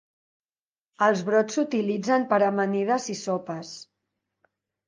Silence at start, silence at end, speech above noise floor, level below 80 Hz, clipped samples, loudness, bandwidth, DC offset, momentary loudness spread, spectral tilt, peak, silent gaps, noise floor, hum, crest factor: 1 s; 1.05 s; over 66 dB; -78 dBFS; under 0.1%; -24 LUFS; 10 kHz; under 0.1%; 14 LU; -5 dB/octave; -8 dBFS; none; under -90 dBFS; none; 18 dB